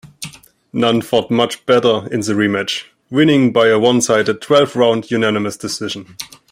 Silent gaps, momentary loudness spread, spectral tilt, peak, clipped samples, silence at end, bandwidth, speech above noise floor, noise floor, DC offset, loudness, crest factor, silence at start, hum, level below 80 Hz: none; 14 LU; -4.5 dB/octave; -2 dBFS; under 0.1%; 0.25 s; 16 kHz; 20 dB; -35 dBFS; under 0.1%; -15 LUFS; 14 dB; 0.05 s; none; -58 dBFS